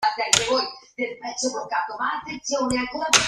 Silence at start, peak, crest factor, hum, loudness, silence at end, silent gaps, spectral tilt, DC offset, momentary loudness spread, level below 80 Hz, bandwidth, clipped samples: 0 s; 0 dBFS; 24 dB; none; -24 LUFS; 0 s; none; -1 dB/octave; under 0.1%; 11 LU; -54 dBFS; 15.5 kHz; under 0.1%